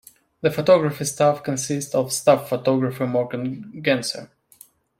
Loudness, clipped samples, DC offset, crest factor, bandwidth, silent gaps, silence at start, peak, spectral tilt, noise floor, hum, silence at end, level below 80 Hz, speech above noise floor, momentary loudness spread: -21 LUFS; under 0.1%; under 0.1%; 20 dB; 16.5 kHz; none; 0.45 s; -2 dBFS; -4.5 dB/octave; -52 dBFS; none; 0.75 s; -64 dBFS; 31 dB; 10 LU